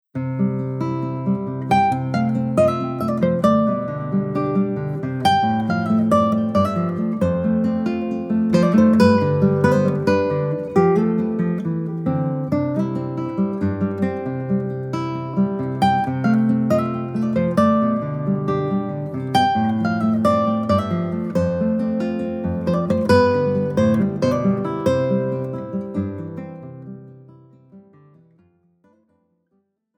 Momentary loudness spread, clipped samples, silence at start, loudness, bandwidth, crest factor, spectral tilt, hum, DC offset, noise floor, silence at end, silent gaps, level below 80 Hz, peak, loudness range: 9 LU; under 0.1%; 0.15 s; -20 LUFS; 12 kHz; 18 dB; -8 dB/octave; none; under 0.1%; -68 dBFS; 2.2 s; none; -52 dBFS; -2 dBFS; 6 LU